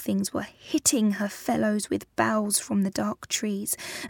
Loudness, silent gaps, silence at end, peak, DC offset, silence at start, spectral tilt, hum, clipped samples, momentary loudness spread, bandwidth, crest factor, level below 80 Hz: -26 LUFS; none; 0 s; -6 dBFS; under 0.1%; 0 s; -3.5 dB/octave; none; under 0.1%; 7 LU; 18 kHz; 20 dB; -62 dBFS